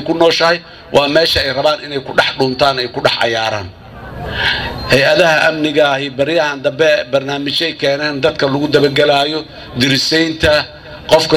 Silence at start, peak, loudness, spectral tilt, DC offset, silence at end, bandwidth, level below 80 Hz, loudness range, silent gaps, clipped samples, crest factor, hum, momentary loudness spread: 0 s; 0 dBFS; -13 LUFS; -4 dB/octave; under 0.1%; 0 s; 16.5 kHz; -38 dBFS; 2 LU; none; under 0.1%; 14 dB; none; 9 LU